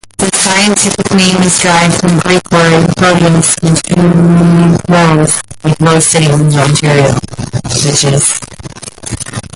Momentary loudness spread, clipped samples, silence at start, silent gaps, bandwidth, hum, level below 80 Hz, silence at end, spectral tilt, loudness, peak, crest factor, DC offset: 12 LU; under 0.1%; 0.2 s; none; 11.5 kHz; none; -34 dBFS; 0.15 s; -4.5 dB/octave; -8 LUFS; 0 dBFS; 8 dB; under 0.1%